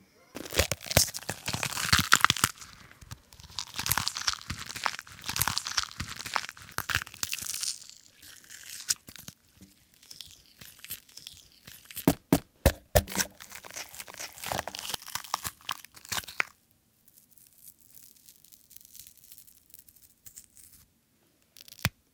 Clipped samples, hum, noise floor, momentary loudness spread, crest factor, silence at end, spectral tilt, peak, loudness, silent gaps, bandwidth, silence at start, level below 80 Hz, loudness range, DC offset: under 0.1%; none; -68 dBFS; 25 LU; 34 dB; 0.25 s; -2.5 dB/octave; 0 dBFS; -30 LUFS; none; 19 kHz; 0.35 s; -46 dBFS; 23 LU; under 0.1%